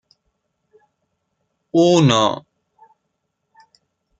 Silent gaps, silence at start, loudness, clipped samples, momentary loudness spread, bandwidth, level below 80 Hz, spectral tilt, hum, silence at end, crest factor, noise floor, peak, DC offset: none; 1.75 s; -16 LUFS; under 0.1%; 10 LU; 9.2 kHz; -60 dBFS; -5.5 dB/octave; none; 1.8 s; 20 dB; -74 dBFS; 0 dBFS; under 0.1%